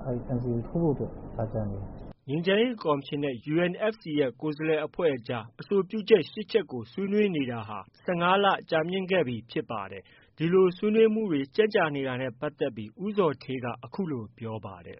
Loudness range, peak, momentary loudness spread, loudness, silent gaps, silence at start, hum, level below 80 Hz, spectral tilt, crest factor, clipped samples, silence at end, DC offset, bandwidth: 3 LU; -8 dBFS; 13 LU; -28 LUFS; none; 0 s; none; -52 dBFS; -5 dB/octave; 20 dB; under 0.1%; 0.05 s; under 0.1%; 5.8 kHz